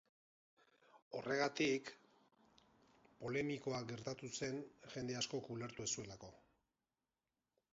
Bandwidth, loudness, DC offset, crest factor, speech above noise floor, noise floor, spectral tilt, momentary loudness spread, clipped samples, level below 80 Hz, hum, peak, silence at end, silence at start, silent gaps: 7.6 kHz; -43 LUFS; under 0.1%; 20 dB; over 46 dB; under -90 dBFS; -3.5 dB/octave; 13 LU; under 0.1%; -78 dBFS; none; -26 dBFS; 1.4 s; 0.95 s; 1.02-1.11 s